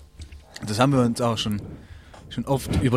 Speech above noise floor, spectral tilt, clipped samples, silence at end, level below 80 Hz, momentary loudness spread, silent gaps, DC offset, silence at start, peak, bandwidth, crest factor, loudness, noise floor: 22 dB; -6 dB/octave; under 0.1%; 0 s; -42 dBFS; 24 LU; none; under 0.1%; 0 s; -4 dBFS; 15.5 kHz; 20 dB; -24 LUFS; -44 dBFS